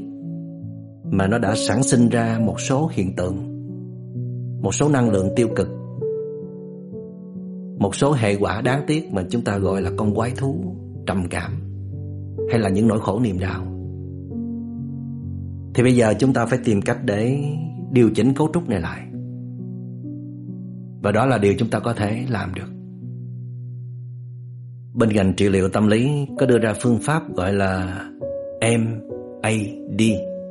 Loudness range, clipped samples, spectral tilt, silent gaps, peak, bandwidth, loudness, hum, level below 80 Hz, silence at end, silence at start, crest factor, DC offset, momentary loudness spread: 5 LU; under 0.1%; -6.5 dB/octave; none; -4 dBFS; 11.5 kHz; -21 LUFS; none; -50 dBFS; 0 s; 0 s; 18 dB; under 0.1%; 16 LU